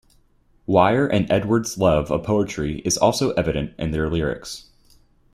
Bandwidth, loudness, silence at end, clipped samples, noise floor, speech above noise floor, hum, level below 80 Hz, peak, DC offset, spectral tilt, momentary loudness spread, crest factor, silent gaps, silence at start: 16 kHz; -21 LUFS; 0.75 s; under 0.1%; -58 dBFS; 38 dB; none; -40 dBFS; -2 dBFS; under 0.1%; -5 dB/octave; 9 LU; 20 dB; none; 0.7 s